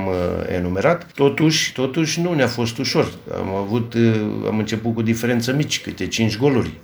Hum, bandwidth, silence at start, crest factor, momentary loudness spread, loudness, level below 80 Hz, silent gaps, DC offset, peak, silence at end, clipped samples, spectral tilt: none; over 20 kHz; 0 s; 18 dB; 6 LU; -20 LUFS; -48 dBFS; none; under 0.1%; -2 dBFS; 0 s; under 0.1%; -5 dB/octave